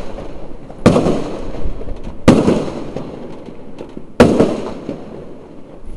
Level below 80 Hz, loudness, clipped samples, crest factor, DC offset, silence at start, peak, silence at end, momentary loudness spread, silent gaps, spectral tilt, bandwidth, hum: -30 dBFS; -15 LUFS; 0.1%; 16 dB; under 0.1%; 0 s; 0 dBFS; 0 s; 23 LU; none; -7 dB/octave; 12 kHz; none